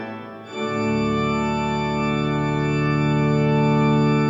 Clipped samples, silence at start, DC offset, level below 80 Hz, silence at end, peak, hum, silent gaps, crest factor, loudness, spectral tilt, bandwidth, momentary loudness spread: under 0.1%; 0 s; under 0.1%; -42 dBFS; 0 s; -8 dBFS; none; none; 12 dB; -21 LUFS; -7.5 dB/octave; 7.4 kHz; 9 LU